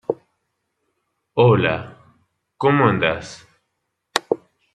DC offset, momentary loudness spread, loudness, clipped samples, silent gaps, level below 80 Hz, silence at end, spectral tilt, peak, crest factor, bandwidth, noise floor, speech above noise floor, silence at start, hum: under 0.1%; 15 LU; -19 LUFS; under 0.1%; none; -56 dBFS; 0.4 s; -6 dB/octave; 0 dBFS; 22 dB; 13 kHz; -75 dBFS; 58 dB; 0.1 s; none